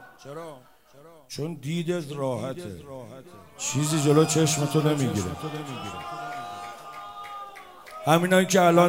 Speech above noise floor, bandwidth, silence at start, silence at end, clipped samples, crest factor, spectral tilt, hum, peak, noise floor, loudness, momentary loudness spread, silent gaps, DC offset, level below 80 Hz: 20 dB; 16 kHz; 0 s; 0 s; under 0.1%; 20 dB; -5 dB/octave; none; -6 dBFS; -44 dBFS; -25 LUFS; 21 LU; none; 0.1%; -64 dBFS